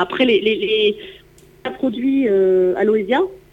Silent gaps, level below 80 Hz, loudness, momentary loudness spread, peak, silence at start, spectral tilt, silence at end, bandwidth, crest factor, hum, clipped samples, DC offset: none; -54 dBFS; -17 LUFS; 10 LU; -4 dBFS; 0 s; -6.5 dB/octave; 0.15 s; 7.6 kHz; 14 dB; 60 Hz at -55 dBFS; under 0.1%; under 0.1%